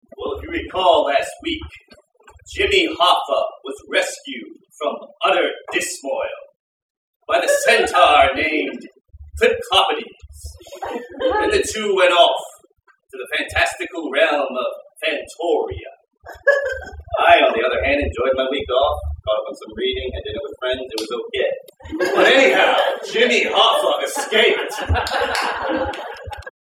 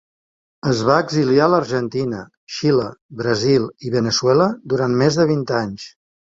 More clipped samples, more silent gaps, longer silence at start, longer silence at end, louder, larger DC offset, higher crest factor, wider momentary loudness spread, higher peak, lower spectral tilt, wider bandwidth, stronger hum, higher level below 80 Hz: neither; first, 6.56-7.20 s vs 2.37-2.47 s, 3.01-3.09 s; second, 0.2 s vs 0.65 s; about the same, 0.3 s vs 0.4 s; about the same, -18 LUFS vs -18 LUFS; neither; about the same, 20 dB vs 16 dB; first, 17 LU vs 12 LU; about the same, 0 dBFS vs -2 dBFS; second, -3 dB/octave vs -5.5 dB/octave; first, 17 kHz vs 7.8 kHz; neither; first, -40 dBFS vs -54 dBFS